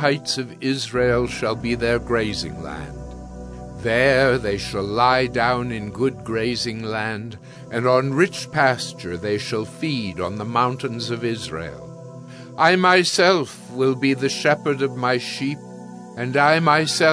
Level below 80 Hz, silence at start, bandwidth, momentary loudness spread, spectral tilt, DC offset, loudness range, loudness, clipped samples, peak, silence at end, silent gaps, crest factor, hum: -44 dBFS; 0 s; 11 kHz; 19 LU; -4.5 dB/octave; under 0.1%; 5 LU; -21 LUFS; under 0.1%; -2 dBFS; 0 s; none; 20 dB; none